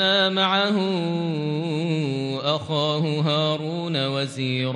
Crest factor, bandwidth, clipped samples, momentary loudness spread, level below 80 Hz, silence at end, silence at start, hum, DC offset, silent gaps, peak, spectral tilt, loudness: 16 dB; 10 kHz; under 0.1%; 6 LU; -68 dBFS; 0 s; 0 s; none; under 0.1%; none; -8 dBFS; -6 dB/octave; -23 LUFS